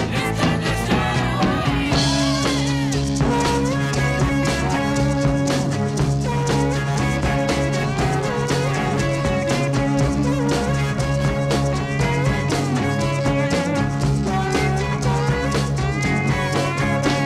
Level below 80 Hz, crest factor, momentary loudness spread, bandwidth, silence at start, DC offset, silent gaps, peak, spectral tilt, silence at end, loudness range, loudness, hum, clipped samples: -32 dBFS; 12 dB; 2 LU; 13.5 kHz; 0 s; under 0.1%; none; -6 dBFS; -5.5 dB/octave; 0 s; 1 LU; -20 LUFS; none; under 0.1%